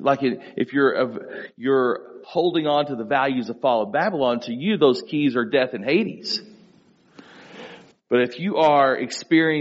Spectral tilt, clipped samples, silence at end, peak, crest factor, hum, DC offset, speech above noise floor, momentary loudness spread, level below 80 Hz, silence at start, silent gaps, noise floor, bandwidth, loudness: -3.5 dB/octave; under 0.1%; 0 s; -4 dBFS; 18 dB; none; under 0.1%; 35 dB; 9 LU; -70 dBFS; 0 s; none; -56 dBFS; 7.6 kHz; -22 LUFS